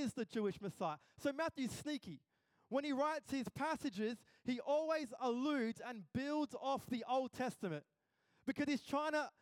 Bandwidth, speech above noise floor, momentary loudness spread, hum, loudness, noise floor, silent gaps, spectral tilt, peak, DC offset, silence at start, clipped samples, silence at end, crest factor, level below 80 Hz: 17 kHz; 38 dB; 8 LU; none; -42 LUFS; -79 dBFS; none; -5 dB/octave; -26 dBFS; under 0.1%; 0 s; under 0.1%; 0.1 s; 16 dB; -78 dBFS